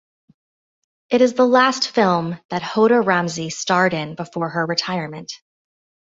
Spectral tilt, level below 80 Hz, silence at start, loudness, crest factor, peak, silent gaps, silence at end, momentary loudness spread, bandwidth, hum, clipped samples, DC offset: -4.5 dB/octave; -64 dBFS; 1.1 s; -18 LUFS; 18 dB; -2 dBFS; 2.45-2.49 s; 0.65 s; 13 LU; 7.8 kHz; none; under 0.1%; under 0.1%